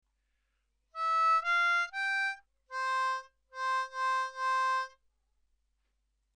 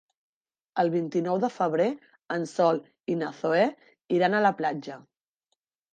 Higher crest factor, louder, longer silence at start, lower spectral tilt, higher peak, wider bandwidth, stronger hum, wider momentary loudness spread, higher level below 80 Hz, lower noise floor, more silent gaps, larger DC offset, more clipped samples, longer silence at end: about the same, 14 dB vs 18 dB; second, -31 LUFS vs -27 LUFS; first, 0.95 s vs 0.75 s; second, 3.5 dB/octave vs -6.5 dB/octave; second, -20 dBFS vs -10 dBFS; first, 10.5 kHz vs 9.2 kHz; neither; first, 15 LU vs 11 LU; about the same, -78 dBFS vs -80 dBFS; about the same, -78 dBFS vs -80 dBFS; neither; neither; neither; first, 1.5 s vs 0.9 s